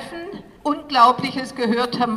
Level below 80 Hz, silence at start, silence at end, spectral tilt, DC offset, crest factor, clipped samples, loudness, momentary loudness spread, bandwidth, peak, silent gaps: -56 dBFS; 0 s; 0 s; -5 dB/octave; under 0.1%; 18 dB; under 0.1%; -19 LUFS; 18 LU; 13.5 kHz; -2 dBFS; none